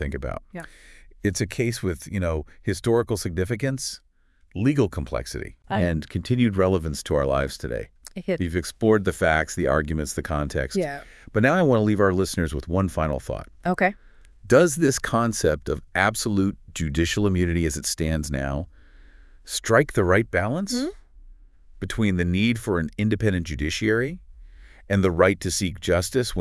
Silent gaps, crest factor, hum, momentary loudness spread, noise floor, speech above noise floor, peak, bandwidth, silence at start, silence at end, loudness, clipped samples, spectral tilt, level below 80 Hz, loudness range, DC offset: none; 20 dB; none; 11 LU; -48 dBFS; 25 dB; -2 dBFS; 12 kHz; 0 s; 0 s; -24 LUFS; under 0.1%; -5.5 dB/octave; -40 dBFS; 3 LU; under 0.1%